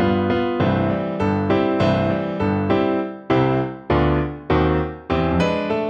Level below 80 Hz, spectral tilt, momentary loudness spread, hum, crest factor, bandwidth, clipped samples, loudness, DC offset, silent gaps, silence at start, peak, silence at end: -36 dBFS; -8.5 dB/octave; 4 LU; none; 14 dB; 8 kHz; under 0.1%; -20 LUFS; under 0.1%; none; 0 s; -6 dBFS; 0 s